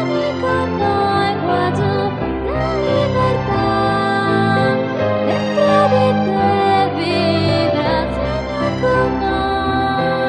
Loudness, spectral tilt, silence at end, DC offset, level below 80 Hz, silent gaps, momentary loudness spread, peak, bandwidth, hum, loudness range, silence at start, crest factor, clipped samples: -16 LUFS; -7 dB/octave; 0 s; under 0.1%; -34 dBFS; none; 5 LU; -2 dBFS; 11 kHz; none; 2 LU; 0 s; 14 dB; under 0.1%